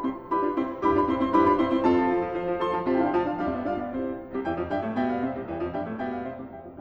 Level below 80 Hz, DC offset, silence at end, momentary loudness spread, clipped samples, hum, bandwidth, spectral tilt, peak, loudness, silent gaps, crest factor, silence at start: -50 dBFS; under 0.1%; 0 s; 10 LU; under 0.1%; none; 6.6 kHz; -8 dB/octave; -10 dBFS; -26 LUFS; none; 16 dB; 0 s